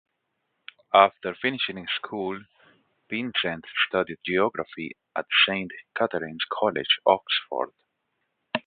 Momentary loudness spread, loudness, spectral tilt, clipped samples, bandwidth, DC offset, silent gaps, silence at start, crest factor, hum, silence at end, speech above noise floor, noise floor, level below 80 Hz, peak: 13 LU; -25 LUFS; -8 dB/octave; under 0.1%; 4.8 kHz; under 0.1%; none; 0.95 s; 26 dB; none; 0.05 s; 52 dB; -77 dBFS; -66 dBFS; -2 dBFS